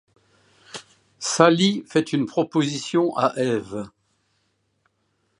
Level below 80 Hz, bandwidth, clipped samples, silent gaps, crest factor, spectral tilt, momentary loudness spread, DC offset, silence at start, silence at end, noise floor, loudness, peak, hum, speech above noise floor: -66 dBFS; 11 kHz; under 0.1%; none; 24 dB; -4.5 dB/octave; 23 LU; under 0.1%; 0.75 s; 1.5 s; -70 dBFS; -21 LUFS; 0 dBFS; none; 49 dB